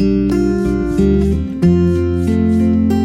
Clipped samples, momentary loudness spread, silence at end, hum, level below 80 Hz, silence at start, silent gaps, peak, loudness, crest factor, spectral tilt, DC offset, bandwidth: under 0.1%; 3 LU; 0 s; none; -26 dBFS; 0 s; none; -2 dBFS; -14 LUFS; 12 dB; -9 dB/octave; under 0.1%; 12.5 kHz